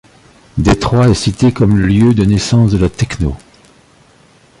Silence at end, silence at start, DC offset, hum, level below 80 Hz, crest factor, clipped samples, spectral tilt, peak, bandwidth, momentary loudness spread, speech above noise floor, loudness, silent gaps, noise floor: 1.25 s; 0.55 s; under 0.1%; none; -28 dBFS; 12 dB; under 0.1%; -6.5 dB/octave; 0 dBFS; 11.5 kHz; 9 LU; 36 dB; -12 LUFS; none; -46 dBFS